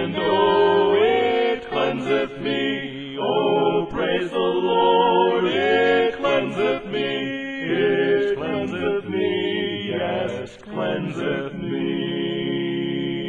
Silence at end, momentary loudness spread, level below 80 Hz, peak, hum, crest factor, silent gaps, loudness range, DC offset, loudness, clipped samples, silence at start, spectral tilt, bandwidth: 0 s; 9 LU; -56 dBFS; -6 dBFS; none; 16 dB; none; 6 LU; under 0.1%; -21 LUFS; under 0.1%; 0 s; -6.5 dB/octave; 7.6 kHz